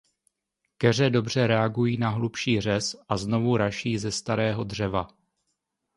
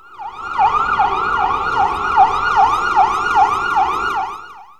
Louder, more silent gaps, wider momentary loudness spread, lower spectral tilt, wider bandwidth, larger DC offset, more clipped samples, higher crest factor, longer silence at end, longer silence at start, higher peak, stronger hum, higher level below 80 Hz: second, -25 LUFS vs -15 LUFS; neither; second, 6 LU vs 10 LU; first, -5.5 dB/octave vs -3.5 dB/octave; second, 11.5 kHz vs 13 kHz; second, under 0.1% vs 0.4%; neither; about the same, 20 dB vs 16 dB; first, 0.9 s vs 0.15 s; first, 0.8 s vs 0.1 s; second, -6 dBFS vs -2 dBFS; neither; second, -54 dBFS vs -42 dBFS